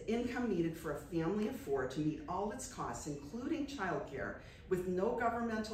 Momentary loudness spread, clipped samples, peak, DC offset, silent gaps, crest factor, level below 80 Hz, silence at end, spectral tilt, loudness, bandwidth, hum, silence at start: 8 LU; under 0.1%; -24 dBFS; under 0.1%; none; 16 dB; -58 dBFS; 0 s; -6 dB/octave; -39 LUFS; 16 kHz; none; 0 s